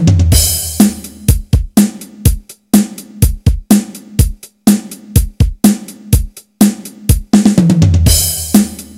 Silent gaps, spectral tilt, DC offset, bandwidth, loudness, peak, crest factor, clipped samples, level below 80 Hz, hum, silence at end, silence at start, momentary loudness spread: none; -5 dB/octave; under 0.1%; over 20 kHz; -12 LUFS; 0 dBFS; 12 dB; 1%; -20 dBFS; none; 0.15 s; 0 s; 7 LU